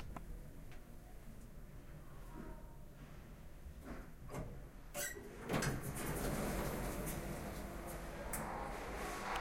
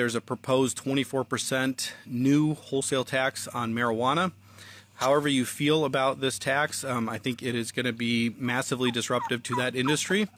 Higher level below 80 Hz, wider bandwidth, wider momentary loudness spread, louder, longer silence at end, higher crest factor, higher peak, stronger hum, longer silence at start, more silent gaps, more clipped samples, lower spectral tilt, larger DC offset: first, -52 dBFS vs -68 dBFS; about the same, 16 kHz vs 15.5 kHz; first, 16 LU vs 6 LU; second, -45 LUFS vs -27 LUFS; about the same, 0 s vs 0.1 s; about the same, 20 dB vs 16 dB; second, -24 dBFS vs -12 dBFS; neither; about the same, 0 s vs 0 s; neither; neither; about the same, -4.5 dB/octave vs -4 dB/octave; neither